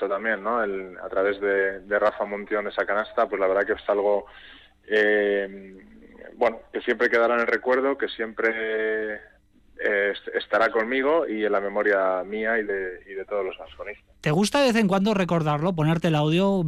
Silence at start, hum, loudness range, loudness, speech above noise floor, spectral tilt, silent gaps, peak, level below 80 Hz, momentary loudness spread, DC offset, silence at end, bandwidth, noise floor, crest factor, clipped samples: 0 s; none; 2 LU; -24 LUFS; 22 dB; -6 dB/octave; none; -10 dBFS; -58 dBFS; 10 LU; under 0.1%; 0 s; 13.5 kHz; -46 dBFS; 14 dB; under 0.1%